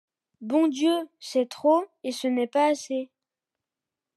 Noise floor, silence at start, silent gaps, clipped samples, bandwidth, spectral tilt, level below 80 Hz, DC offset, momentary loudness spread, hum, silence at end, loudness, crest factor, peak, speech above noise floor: -88 dBFS; 0.4 s; none; under 0.1%; 12.5 kHz; -3.5 dB/octave; under -90 dBFS; under 0.1%; 10 LU; none; 1.1 s; -25 LUFS; 16 dB; -10 dBFS; 64 dB